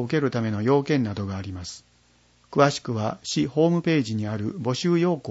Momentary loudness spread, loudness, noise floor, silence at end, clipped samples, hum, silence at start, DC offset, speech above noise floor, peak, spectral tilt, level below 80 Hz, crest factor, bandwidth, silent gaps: 11 LU; -24 LUFS; -60 dBFS; 0 s; under 0.1%; 60 Hz at -55 dBFS; 0 s; under 0.1%; 36 dB; -4 dBFS; -6 dB/octave; -60 dBFS; 20 dB; 8 kHz; none